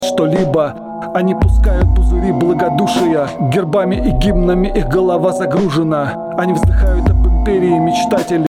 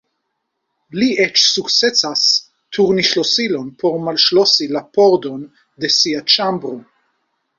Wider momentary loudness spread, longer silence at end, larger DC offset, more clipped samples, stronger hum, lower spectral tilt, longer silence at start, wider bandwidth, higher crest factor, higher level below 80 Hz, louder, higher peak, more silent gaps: second, 3 LU vs 13 LU; second, 0.05 s vs 0.8 s; neither; neither; neither; first, -7 dB/octave vs -2.5 dB/octave; second, 0 s vs 0.9 s; first, 13 kHz vs 7.6 kHz; second, 10 dB vs 16 dB; first, -18 dBFS vs -62 dBFS; about the same, -14 LUFS vs -14 LUFS; about the same, -2 dBFS vs 0 dBFS; neither